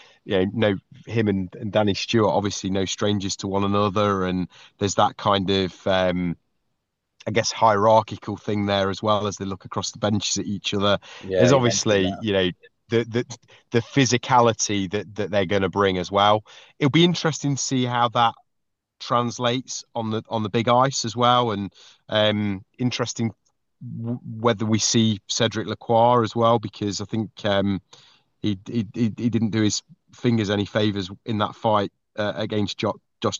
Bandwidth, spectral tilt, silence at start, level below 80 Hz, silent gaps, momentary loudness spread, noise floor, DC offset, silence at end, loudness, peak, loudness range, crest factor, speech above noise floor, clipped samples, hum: 8.2 kHz; -4.5 dB/octave; 0.25 s; -60 dBFS; none; 10 LU; -78 dBFS; under 0.1%; 0 s; -22 LUFS; -2 dBFS; 3 LU; 20 dB; 56 dB; under 0.1%; none